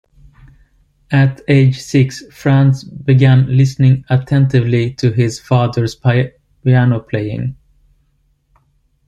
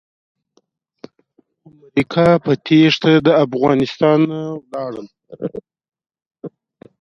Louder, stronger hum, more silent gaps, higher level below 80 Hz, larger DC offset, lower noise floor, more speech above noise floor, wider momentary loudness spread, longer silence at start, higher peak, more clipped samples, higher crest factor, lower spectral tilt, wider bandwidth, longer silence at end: about the same, -14 LUFS vs -15 LUFS; neither; second, none vs 6.26-6.31 s; first, -46 dBFS vs -56 dBFS; neither; about the same, -59 dBFS vs -62 dBFS; about the same, 47 dB vs 47 dB; second, 9 LU vs 23 LU; second, 1.1 s vs 1.95 s; about the same, -2 dBFS vs 0 dBFS; neither; second, 12 dB vs 18 dB; about the same, -7.5 dB/octave vs -7 dB/octave; first, 7.8 kHz vs 7 kHz; first, 1.55 s vs 0.55 s